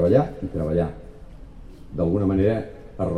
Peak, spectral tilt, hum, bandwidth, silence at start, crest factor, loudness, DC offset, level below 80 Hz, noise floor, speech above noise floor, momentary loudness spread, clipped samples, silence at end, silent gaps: -4 dBFS; -10 dB/octave; none; 10 kHz; 0 s; 18 dB; -23 LUFS; 0.4%; -40 dBFS; -41 dBFS; 20 dB; 17 LU; under 0.1%; 0 s; none